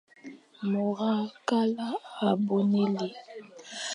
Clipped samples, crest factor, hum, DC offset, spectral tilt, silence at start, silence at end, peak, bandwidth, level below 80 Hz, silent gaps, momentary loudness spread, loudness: under 0.1%; 18 dB; none; under 0.1%; -6 dB/octave; 0.25 s; 0 s; -12 dBFS; 10.5 kHz; -82 dBFS; none; 20 LU; -29 LUFS